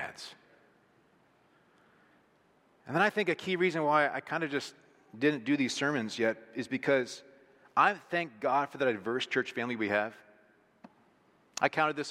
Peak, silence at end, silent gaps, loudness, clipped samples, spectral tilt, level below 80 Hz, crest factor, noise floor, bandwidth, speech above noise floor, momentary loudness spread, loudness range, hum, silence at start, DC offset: -10 dBFS; 0 s; none; -31 LUFS; under 0.1%; -4.5 dB/octave; -82 dBFS; 22 dB; -67 dBFS; 14 kHz; 36 dB; 12 LU; 4 LU; none; 0 s; under 0.1%